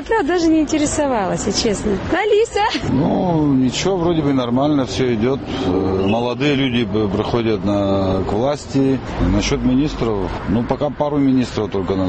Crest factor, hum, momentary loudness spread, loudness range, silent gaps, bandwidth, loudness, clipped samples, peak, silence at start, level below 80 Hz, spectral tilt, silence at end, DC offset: 14 dB; none; 4 LU; 2 LU; none; 8.8 kHz; -18 LUFS; under 0.1%; -2 dBFS; 0 s; -34 dBFS; -5.5 dB/octave; 0 s; 0.2%